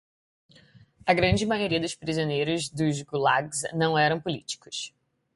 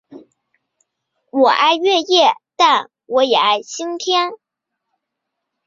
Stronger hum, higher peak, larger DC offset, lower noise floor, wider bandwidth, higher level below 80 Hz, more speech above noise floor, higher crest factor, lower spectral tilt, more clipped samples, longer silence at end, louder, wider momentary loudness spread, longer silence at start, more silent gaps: neither; second, -6 dBFS vs -2 dBFS; neither; second, -56 dBFS vs -78 dBFS; first, 11.5 kHz vs 7.6 kHz; first, -50 dBFS vs -70 dBFS; second, 30 dB vs 63 dB; about the same, 20 dB vs 16 dB; first, -4.5 dB/octave vs -1.5 dB/octave; neither; second, 0.5 s vs 1.3 s; second, -26 LUFS vs -15 LUFS; about the same, 11 LU vs 10 LU; first, 1.05 s vs 0.1 s; neither